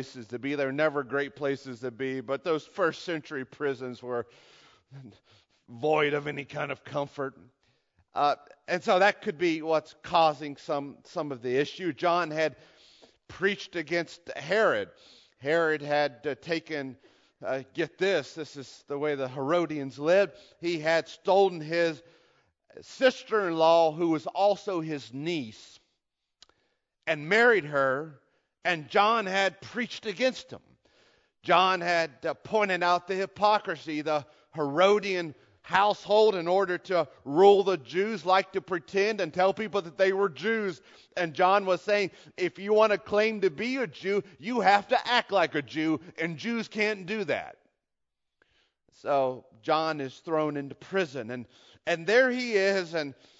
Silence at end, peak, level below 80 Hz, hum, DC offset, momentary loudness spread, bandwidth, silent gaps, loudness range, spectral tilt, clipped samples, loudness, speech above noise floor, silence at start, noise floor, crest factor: 0.25 s; -6 dBFS; -74 dBFS; none; under 0.1%; 13 LU; 7.8 kHz; none; 7 LU; -5 dB/octave; under 0.1%; -28 LUFS; 55 dB; 0 s; -82 dBFS; 22 dB